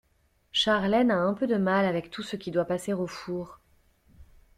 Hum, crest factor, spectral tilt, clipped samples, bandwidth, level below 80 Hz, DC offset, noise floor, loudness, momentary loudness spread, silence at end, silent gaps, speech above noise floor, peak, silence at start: none; 16 dB; -5.5 dB/octave; under 0.1%; 13 kHz; -60 dBFS; under 0.1%; -68 dBFS; -27 LUFS; 12 LU; 0.35 s; none; 41 dB; -12 dBFS; 0.55 s